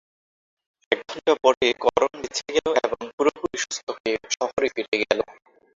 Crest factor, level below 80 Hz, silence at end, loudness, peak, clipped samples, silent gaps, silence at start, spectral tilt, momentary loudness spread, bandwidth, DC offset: 22 dB; -58 dBFS; 0.5 s; -24 LUFS; -2 dBFS; under 0.1%; 1.57-1.61 s, 3.13-3.18 s, 3.83-3.87 s, 4.00-4.04 s, 4.53-4.57 s, 4.88-4.92 s; 0.9 s; -2 dB/octave; 9 LU; 7.8 kHz; under 0.1%